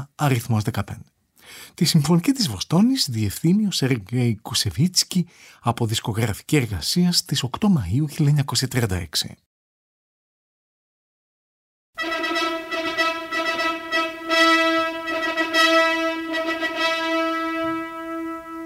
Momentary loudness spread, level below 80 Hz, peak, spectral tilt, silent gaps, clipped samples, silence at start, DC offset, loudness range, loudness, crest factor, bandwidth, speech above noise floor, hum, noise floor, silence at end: 10 LU; -52 dBFS; -4 dBFS; -4.5 dB/octave; 9.46-11.93 s; under 0.1%; 0 s; under 0.1%; 9 LU; -21 LUFS; 18 dB; 16 kHz; over 69 dB; none; under -90 dBFS; 0 s